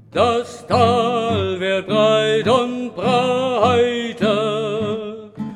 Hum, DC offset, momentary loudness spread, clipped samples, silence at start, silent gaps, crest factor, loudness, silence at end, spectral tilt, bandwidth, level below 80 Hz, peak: none; under 0.1%; 8 LU; under 0.1%; 0.15 s; none; 16 dB; -18 LUFS; 0 s; -5.5 dB/octave; 11.5 kHz; -58 dBFS; -2 dBFS